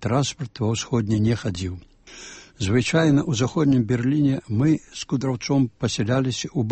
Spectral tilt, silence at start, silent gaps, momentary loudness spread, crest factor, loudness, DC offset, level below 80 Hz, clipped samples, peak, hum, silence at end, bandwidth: -6 dB/octave; 0 s; none; 11 LU; 16 dB; -22 LUFS; under 0.1%; -50 dBFS; under 0.1%; -6 dBFS; none; 0 s; 8.8 kHz